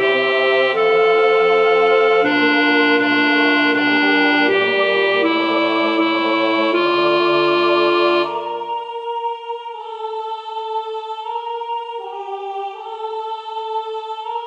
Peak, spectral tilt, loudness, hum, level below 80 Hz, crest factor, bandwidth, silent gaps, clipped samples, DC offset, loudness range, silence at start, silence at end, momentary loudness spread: -2 dBFS; -5 dB/octave; -16 LUFS; none; -68 dBFS; 14 dB; 7.8 kHz; none; under 0.1%; under 0.1%; 12 LU; 0 s; 0 s; 13 LU